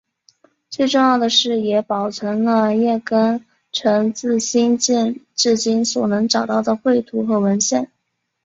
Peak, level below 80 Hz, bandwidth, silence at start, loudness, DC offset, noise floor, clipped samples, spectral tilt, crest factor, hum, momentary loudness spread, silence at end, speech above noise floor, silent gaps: -2 dBFS; -64 dBFS; 8 kHz; 0.7 s; -18 LUFS; under 0.1%; -73 dBFS; under 0.1%; -3.5 dB/octave; 16 dB; none; 7 LU; 0.6 s; 56 dB; none